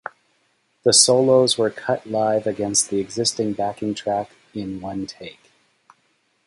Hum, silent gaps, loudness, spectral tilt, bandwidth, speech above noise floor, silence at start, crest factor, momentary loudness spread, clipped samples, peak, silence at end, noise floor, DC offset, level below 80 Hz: none; none; -20 LUFS; -3 dB/octave; 11.5 kHz; 46 dB; 0.85 s; 22 dB; 19 LU; under 0.1%; 0 dBFS; 1.15 s; -66 dBFS; under 0.1%; -58 dBFS